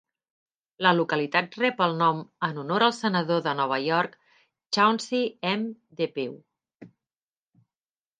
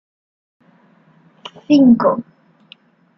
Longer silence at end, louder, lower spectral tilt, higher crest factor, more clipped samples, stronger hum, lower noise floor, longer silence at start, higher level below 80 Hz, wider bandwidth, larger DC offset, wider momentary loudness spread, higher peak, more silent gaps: first, 1.35 s vs 0.95 s; second, -25 LUFS vs -13 LUFS; second, -5 dB/octave vs -7.5 dB/octave; first, 22 dB vs 16 dB; neither; neither; first, under -90 dBFS vs -52 dBFS; second, 0.8 s vs 1.7 s; second, -78 dBFS vs -60 dBFS; first, 9.6 kHz vs 6.2 kHz; neither; second, 9 LU vs 27 LU; about the same, -4 dBFS vs -2 dBFS; neither